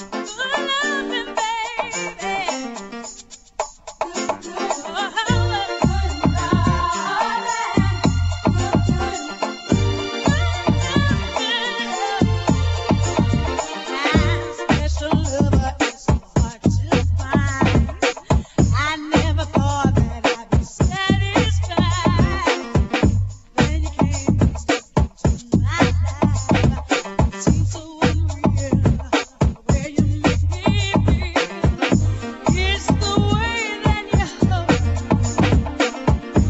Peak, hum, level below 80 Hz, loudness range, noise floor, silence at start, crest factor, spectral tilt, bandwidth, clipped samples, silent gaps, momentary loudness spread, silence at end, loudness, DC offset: -2 dBFS; none; -28 dBFS; 3 LU; -41 dBFS; 0 s; 18 dB; -5.5 dB/octave; 8.2 kHz; under 0.1%; none; 6 LU; 0 s; -20 LUFS; under 0.1%